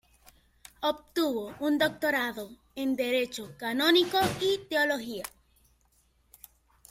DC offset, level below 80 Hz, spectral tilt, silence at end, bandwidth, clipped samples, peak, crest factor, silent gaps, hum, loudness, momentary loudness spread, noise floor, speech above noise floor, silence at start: under 0.1%; -64 dBFS; -3.5 dB/octave; 1.6 s; 16.5 kHz; under 0.1%; -10 dBFS; 20 dB; none; none; -28 LUFS; 13 LU; -68 dBFS; 39 dB; 0.8 s